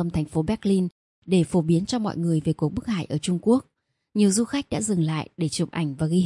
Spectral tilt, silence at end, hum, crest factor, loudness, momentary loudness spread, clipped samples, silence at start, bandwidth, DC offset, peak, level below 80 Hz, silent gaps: -6 dB/octave; 0 s; none; 16 dB; -24 LUFS; 6 LU; under 0.1%; 0 s; 11.5 kHz; under 0.1%; -8 dBFS; -52 dBFS; 0.92-1.22 s